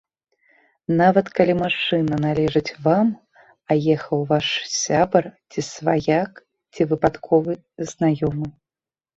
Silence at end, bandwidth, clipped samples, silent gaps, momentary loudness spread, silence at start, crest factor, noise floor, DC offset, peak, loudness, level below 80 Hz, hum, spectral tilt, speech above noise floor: 0.65 s; 8 kHz; under 0.1%; none; 12 LU; 0.9 s; 20 dB; under -90 dBFS; under 0.1%; 0 dBFS; -21 LUFS; -52 dBFS; none; -5.5 dB/octave; over 70 dB